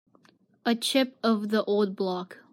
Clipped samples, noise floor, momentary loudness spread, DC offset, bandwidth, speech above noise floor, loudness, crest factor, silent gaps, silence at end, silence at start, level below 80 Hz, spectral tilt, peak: under 0.1%; -62 dBFS; 7 LU; under 0.1%; 16 kHz; 36 dB; -27 LUFS; 16 dB; none; 0.15 s; 0.65 s; -80 dBFS; -4.5 dB/octave; -12 dBFS